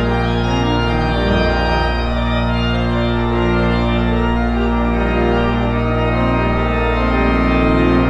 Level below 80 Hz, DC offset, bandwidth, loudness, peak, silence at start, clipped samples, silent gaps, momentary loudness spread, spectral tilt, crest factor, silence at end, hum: -22 dBFS; under 0.1%; 7.8 kHz; -16 LUFS; -2 dBFS; 0 s; under 0.1%; none; 3 LU; -7.5 dB/octave; 14 dB; 0 s; none